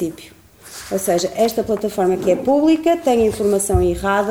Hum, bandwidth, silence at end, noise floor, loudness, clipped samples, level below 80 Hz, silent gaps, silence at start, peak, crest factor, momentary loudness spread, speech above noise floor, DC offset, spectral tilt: none; 18.5 kHz; 0 s; -38 dBFS; -17 LUFS; under 0.1%; -36 dBFS; none; 0 s; -4 dBFS; 14 dB; 9 LU; 21 dB; 0.1%; -5 dB/octave